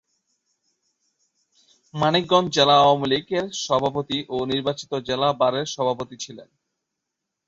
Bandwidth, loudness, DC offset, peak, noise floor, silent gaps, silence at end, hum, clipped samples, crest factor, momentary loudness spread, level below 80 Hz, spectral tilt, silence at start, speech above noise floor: 8 kHz; -21 LUFS; under 0.1%; -4 dBFS; -82 dBFS; none; 1.05 s; none; under 0.1%; 20 dB; 13 LU; -60 dBFS; -4.5 dB/octave; 1.95 s; 61 dB